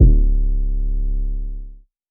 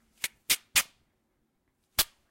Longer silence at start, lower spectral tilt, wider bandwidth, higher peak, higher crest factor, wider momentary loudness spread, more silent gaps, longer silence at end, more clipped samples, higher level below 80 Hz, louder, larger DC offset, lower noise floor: second, 0 s vs 0.25 s; first, -16.5 dB/octave vs 1.5 dB/octave; second, 0.7 kHz vs 16.5 kHz; first, 0 dBFS vs -8 dBFS; second, 16 dB vs 26 dB; first, 16 LU vs 12 LU; neither; about the same, 0.35 s vs 0.25 s; neither; first, -16 dBFS vs -58 dBFS; first, -23 LUFS vs -28 LUFS; neither; second, -37 dBFS vs -76 dBFS